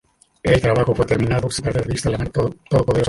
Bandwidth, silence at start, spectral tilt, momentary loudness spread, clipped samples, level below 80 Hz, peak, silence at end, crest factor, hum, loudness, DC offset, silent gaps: 11.5 kHz; 0.45 s; -6 dB/octave; 6 LU; under 0.1%; -36 dBFS; -2 dBFS; 0 s; 16 dB; none; -19 LUFS; under 0.1%; none